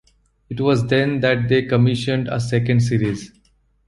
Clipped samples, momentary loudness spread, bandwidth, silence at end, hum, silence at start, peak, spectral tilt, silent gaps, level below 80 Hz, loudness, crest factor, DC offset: under 0.1%; 6 LU; 11.5 kHz; 0.6 s; none; 0.5 s; -2 dBFS; -7 dB/octave; none; -48 dBFS; -19 LUFS; 16 dB; under 0.1%